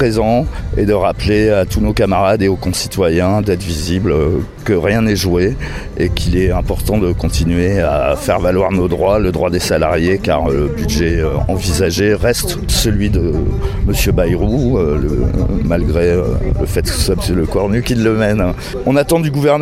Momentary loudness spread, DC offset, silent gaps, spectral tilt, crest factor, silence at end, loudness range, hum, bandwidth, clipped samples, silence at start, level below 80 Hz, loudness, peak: 4 LU; under 0.1%; none; -6 dB/octave; 14 dB; 0 s; 1 LU; none; 16 kHz; under 0.1%; 0 s; -22 dBFS; -15 LUFS; 0 dBFS